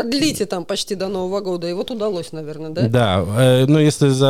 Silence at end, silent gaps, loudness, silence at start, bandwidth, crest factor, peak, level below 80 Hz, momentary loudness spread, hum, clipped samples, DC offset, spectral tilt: 0 s; none; -18 LUFS; 0 s; 15 kHz; 14 dB; -4 dBFS; -50 dBFS; 11 LU; none; under 0.1%; under 0.1%; -6 dB/octave